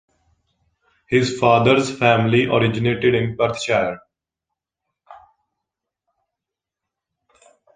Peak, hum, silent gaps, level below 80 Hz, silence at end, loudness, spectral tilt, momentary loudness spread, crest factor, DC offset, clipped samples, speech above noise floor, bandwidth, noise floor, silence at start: -2 dBFS; none; none; -52 dBFS; 2.65 s; -18 LUFS; -6 dB/octave; 6 LU; 20 dB; under 0.1%; under 0.1%; 68 dB; 9.6 kHz; -85 dBFS; 1.1 s